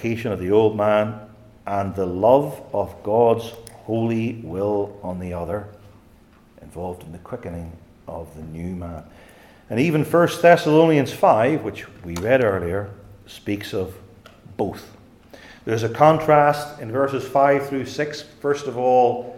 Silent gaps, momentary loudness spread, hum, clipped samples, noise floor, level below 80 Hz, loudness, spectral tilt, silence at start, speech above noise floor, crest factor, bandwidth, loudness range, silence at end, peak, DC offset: none; 20 LU; none; under 0.1%; -51 dBFS; -54 dBFS; -20 LUFS; -6.5 dB/octave; 0 s; 31 dB; 20 dB; 16.5 kHz; 15 LU; 0 s; -2 dBFS; under 0.1%